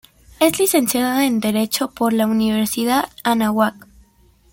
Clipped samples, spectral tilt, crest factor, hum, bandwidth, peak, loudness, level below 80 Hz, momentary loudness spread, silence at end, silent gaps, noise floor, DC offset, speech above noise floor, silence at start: under 0.1%; -3.5 dB/octave; 16 dB; none; 17 kHz; -2 dBFS; -18 LUFS; -52 dBFS; 4 LU; 0.75 s; none; -54 dBFS; under 0.1%; 36 dB; 0.4 s